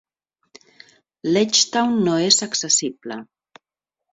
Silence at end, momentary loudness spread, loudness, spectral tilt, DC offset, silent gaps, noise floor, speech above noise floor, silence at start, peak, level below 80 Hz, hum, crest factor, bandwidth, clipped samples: 0.9 s; 17 LU; -18 LUFS; -2.5 dB/octave; under 0.1%; none; -86 dBFS; 66 dB; 1.25 s; -2 dBFS; -66 dBFS; none; 20 dB; 8.4 kHz; under 0.1%